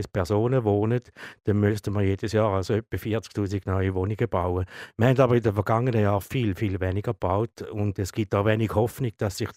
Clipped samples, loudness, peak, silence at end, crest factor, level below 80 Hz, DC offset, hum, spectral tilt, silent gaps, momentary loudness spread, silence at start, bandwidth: under 0.1%; -25 LUFS; -6 dBFS; 0.05 s; 18 dB; -54 dBFS; under 0.1%; none; -7.5 dB/octave; none; 7 LU; 0 s; 16 kHz